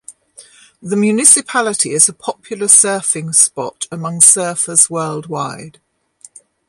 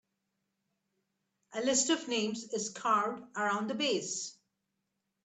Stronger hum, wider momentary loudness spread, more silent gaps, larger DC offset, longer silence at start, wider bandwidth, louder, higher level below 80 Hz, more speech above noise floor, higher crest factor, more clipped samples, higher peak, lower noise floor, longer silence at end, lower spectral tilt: neither; first, 16 LU vs 9 LU; neither; neither; second, 0.1 s vs 1.5 s; first, 16 kHz vs 9.4 kHz; first, -11 LUFS vs -32 LUFS; first, -62 dBFS vs -82 dBFS; second, 31 dB vs 51 dB; about the same, 16 dB vs 20 dB; first, 0.3% vs under 0.1%; first, 0 dBFS vs -16 dBFS; second, -45 dBFS vs -84 dBFS; about the same, 1 s vs 0.9 s; about the same, -2.5 dB/octave vs -2 dB/octave